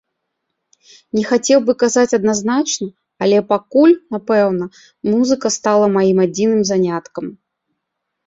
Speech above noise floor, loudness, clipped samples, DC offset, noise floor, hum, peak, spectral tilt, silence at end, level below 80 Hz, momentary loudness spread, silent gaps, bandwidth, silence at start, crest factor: 61 dB; -15 LUFS; under 0.1%; under 0.1%; -76 dBFS; none; -2 dBFS; -4.5 dB/octave; 0.95 s; -60 dBFS; 11 LU; none; 8 kHz; 1.15 s; 14 dB